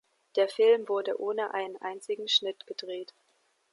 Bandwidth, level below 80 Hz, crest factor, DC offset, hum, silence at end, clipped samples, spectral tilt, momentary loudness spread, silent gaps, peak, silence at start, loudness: 11.5 kHz; -90 dBFS; 18 dB; under 0.1%; none; 0.7 s; under 0.1%; -2 dB/octave; 16 LU; none; -12 dBFS; 0.35 s; -29 LUFS